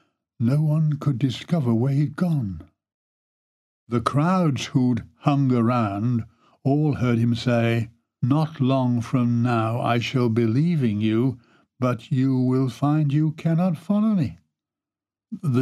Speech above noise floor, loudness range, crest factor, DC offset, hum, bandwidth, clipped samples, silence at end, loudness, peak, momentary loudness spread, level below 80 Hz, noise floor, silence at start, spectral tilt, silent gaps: over 69 dB; 3 LU; 18 dB; under 0.1%; none; 12 kHz; under 0.1%; 0 s; -22 LUFS; -6 dBFS; 6 LU; -58 dBFS; under -90 dBFS; 0.4 s; -8 dB/octave; 2.94-3.87 s